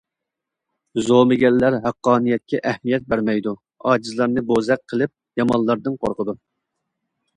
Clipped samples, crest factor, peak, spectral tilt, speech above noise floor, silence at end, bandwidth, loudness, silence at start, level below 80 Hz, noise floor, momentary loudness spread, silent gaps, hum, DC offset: under 0.1%; 20 dB; -2 dBFS; -6.5 dB/octave; 64 dB; 1 s; 10 kHz; -20 LUFS; 0.95 s; -54 dBFS; -83 dBFS; 10 LU; none; none; under 0.1%